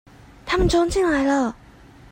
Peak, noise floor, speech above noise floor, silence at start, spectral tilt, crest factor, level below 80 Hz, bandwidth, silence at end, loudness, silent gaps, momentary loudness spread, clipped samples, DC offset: -8 dBFS; -47 dBFS; 28 dB; 0.45 s; -5 dB/octave; 14 dB; -34 dBFS; 16 kHz; 0.6 s; -20 LUFS; none; 8 LU; under 0.1%; under 0.1%